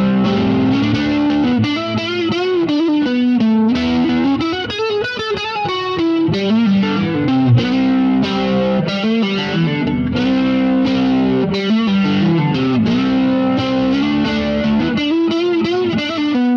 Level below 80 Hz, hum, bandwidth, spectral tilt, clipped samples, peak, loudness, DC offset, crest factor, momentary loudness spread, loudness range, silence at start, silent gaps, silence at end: -42 dBFS; none; 6.8 kHz; -7 dB/octave; under 0.1%; -4 dBFS; -16 LUFS; under 0.1%; 12 dB; 4 LU; 1 LU; 0 s; none; 0 s